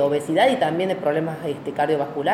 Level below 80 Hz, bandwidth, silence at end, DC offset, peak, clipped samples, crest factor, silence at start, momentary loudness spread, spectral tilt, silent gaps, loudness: -68 dBFS; 15.5 kHz; 0 s; under 0.1%; -6 dBFS; under 0.1%; 16 dB; 0 s; 9 LU; -6 dB/octave; none; -22 LUFS